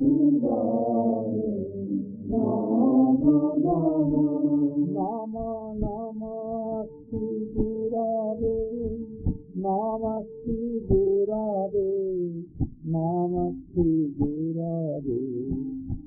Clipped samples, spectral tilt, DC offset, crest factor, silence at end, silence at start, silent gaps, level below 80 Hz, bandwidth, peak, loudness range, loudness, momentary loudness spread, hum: under 0.1%; -16 dB/octave; under 0.1%; 16 dB; 0 s; 0 s; none; -44 dBFS; 1.4 kHz; -10 dBFS; 6 LU; -26 LUFS; 11 LU; none